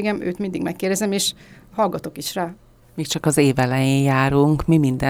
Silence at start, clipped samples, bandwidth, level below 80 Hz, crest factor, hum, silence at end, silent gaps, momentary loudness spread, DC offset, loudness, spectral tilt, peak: 0 s; under 0.1%; over 20 kHz; -44 dBFS; 16 dB; none; 0 s; none; 11 LU; under 0.1%; -20 LUFS; -5.5 dB/octave; -4 dBFS